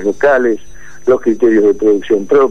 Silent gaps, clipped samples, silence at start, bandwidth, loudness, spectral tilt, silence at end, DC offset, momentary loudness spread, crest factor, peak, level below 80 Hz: none; under 0.1%; 0 s; 7.2 kHz; -12 LUFS; -6 dB/octave; 0 s; 5%; 7 LU; 10 dB; -2 dBFS; -46 dBFS